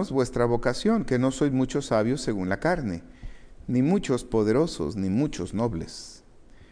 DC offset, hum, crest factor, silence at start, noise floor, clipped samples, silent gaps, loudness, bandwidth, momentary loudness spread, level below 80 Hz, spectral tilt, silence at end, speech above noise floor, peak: under 0.1%; none; 14 dB; 0 s; -50 dBFS; under 0.1%; none; -26 LUFS; 10.5 kHz; 10 LU; -44 dBFS; -6.5 dB/octave; 0.05 s; 25 dB; -10 dBFS